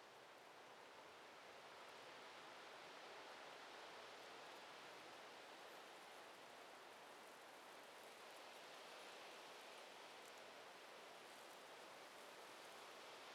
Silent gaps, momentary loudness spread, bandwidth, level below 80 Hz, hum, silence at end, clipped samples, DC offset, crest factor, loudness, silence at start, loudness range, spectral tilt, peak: none; 3 LU; 16.5 kHz; under -90 dBFS; none; 0 s; under 0.1%; under 0.1%; 14 dB; -59 LUFS; 0 s; 2 LU; -1.5 dB/octave; -46 dBFS